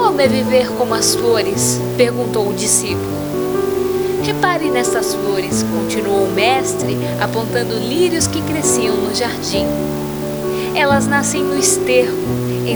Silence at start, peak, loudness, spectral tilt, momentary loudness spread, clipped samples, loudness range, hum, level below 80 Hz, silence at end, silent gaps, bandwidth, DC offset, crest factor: 0 s; 0 dBFS; -16 LUFS; -4 dB/octave; 6 LU; under 0.1%; 2 LU; none; -42 dBFS; 0 s; none; over 20 kHz; under 0.1%; 16 dB